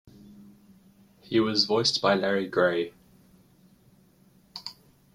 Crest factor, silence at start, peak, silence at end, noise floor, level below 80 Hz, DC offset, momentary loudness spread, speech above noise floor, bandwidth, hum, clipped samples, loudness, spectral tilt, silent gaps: 22 dB; 0.3 s; -8 dBFS; 0.45 s; -60 dBFS; -66 dBFS; under 0.1%; 18 LU; 35 dB; 15.5 kHz; none; under 0.1%; -25 LUFS; -4 dB/octave; none